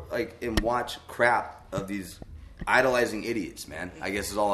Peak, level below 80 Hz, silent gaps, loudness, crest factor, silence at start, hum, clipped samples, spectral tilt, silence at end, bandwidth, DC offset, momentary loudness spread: -6 dBFS; -44 dBFS; none; -28 LUFS; 22 dB; 0 s; none; under 0.1%; -4.5 dB/octave; 0 s; 13.5 kHz; under 0.1%; 14 LU